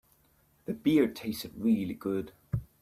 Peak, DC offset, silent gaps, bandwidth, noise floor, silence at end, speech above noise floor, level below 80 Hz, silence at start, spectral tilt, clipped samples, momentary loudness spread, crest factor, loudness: -14 dBFS; under 0.1%; none; 16 kHz; -67 dBFS; 0.2 s; 38 dB; -54 dBFS; 0.7 s; -7 dB/octave; under 0.1%; 12 LU; 18 dB; -31 LUFS